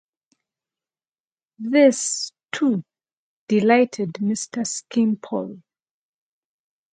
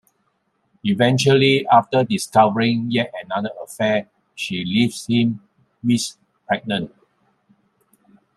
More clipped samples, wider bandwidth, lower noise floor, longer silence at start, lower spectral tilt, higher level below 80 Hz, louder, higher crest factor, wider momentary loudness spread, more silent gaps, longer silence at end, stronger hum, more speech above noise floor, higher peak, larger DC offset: neither; second, 9.4 kHz vs 13.5 kHz; first, under -90 dBFS vs -68 dBFS; first, 1.6 s vs 0.85 s; about the same, -4.5 dB/octave vs -5.5 dB/octave; second, -74 dBFS vs -62 dBFS; about the same, -21 LUFS vs -19 LUFS; about the same, 22 dB vs 18 dB; about the same, 13 LU vs 13 LU; first, 3.17-3.47 s vs none; second, 1.35 s vs 1.5 s; neither; first, over 70 dB vs 50 dB; about the same, -2 dBFS vs -2 dBFS; neither